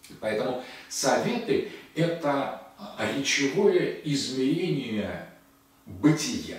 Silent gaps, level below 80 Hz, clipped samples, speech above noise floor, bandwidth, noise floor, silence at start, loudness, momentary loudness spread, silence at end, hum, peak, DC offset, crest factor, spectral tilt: none; -64 dBFS; under 0.1%; 31 dB; 16 kHz; -58 dBFS; 0.05 s; -27 LUFS; 12 LU; 0 s; none; -8 dBFS; under 0.1%; 18 dB; -4.5 dB/octave